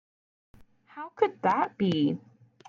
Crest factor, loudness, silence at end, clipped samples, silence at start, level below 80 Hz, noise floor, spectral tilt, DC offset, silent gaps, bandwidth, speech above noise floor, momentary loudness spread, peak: 20 dB; -28 LUFS; 0.5 s; under 0.1%; 0.95 s; -70 dBFS; -45 dBFS; -7.5 dB/octave; under 0.1%; none; 7.2 kHz; 19 dB; 17 LU; -10 dBFS